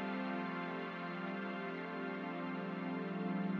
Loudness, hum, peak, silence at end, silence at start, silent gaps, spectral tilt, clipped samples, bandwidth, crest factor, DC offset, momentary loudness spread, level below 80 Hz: -41 LUFS; none; -28 dBFS; 0 s; 0 s; none; -8.5 dB/octave; under 0.1%; 6.2 kHz; 12 dB; under 0.1%; 3 LU; under -90 dBFS